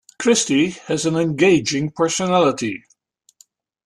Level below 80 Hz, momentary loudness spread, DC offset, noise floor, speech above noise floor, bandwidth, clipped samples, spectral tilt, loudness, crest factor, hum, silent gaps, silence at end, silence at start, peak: -58 dBFS; 8 LU; under 0.1%; -59 dBFS; 42 dB; 12.5 kHz; under 0.1%; -4 dB/octave; -18 LUFS; 16 dB; none; none; 1.1 s; 0.2 s; -4 dBFS